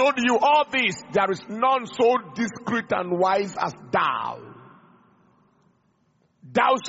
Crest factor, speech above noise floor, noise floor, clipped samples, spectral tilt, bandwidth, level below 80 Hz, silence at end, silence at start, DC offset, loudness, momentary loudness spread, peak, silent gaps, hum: 18 dB; 43 dB; -66 dBFS; under 0.1%; -2.5 dB/octave; 8 kHz; -66 dBFS; 0 s; 0 s; under 0.1%; -23 LUFS; 10 LU; -6 dBFS; none; none